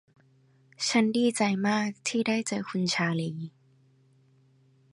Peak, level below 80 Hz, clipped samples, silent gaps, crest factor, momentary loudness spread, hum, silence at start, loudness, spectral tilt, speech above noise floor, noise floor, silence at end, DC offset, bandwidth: -12 dBFS; -76 dBFS; under 0.1%; none; 18 dB; 8 LU; none; 0.8 s; -27 LUFS; -4.5 dB/octave; 35 dB; -63 dBFS; 1.45 s; under 0.1%; 11.5 kHz